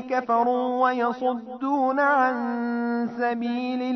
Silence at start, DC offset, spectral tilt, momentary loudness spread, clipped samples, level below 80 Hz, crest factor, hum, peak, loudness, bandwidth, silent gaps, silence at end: 0 s; under 0.1%; -6 dB/octave; 7 LU; under 0.1%; -72 dBFS; 16 dB; none; -8 dBFS; -24 LUFS; 6.2 kHz; none; 0 s